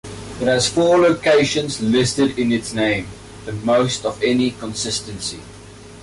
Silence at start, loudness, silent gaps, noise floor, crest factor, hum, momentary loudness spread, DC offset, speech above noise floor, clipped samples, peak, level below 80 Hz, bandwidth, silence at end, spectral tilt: 0.05 s; -18 LUFS; none; -39 dBFS; 12 dB; none; 13 LU; under 0.1%; 21 dB; under 0.1%; -6 dBFS; -46 dBFS; 11.5 kHz; 0 s; -4 dB/octave